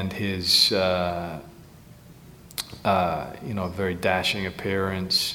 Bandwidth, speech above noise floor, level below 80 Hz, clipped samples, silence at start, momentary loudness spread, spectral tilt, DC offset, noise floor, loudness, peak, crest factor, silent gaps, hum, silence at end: 18.5 kHz; 23 dB; -52 dBFS; under 0.1%; 0 s; 16 LU; -3.5 dB/octave; under 0.1%; -48 dBFS; -24 LUFS; -6 dBFS; 20 dB; none; none; 0 s